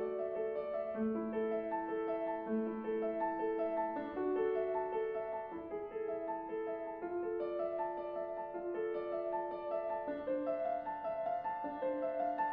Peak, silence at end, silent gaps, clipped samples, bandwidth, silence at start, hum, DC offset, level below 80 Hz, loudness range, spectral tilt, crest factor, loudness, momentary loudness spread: -26 dBFS; 0 s; none; under 0.1%; 5 kHz; 0 s; none; under 0.1%; -70 dBFS; 3 LU; -5.5 dB/octave; 12 dB; -39 LUFS; 5 LU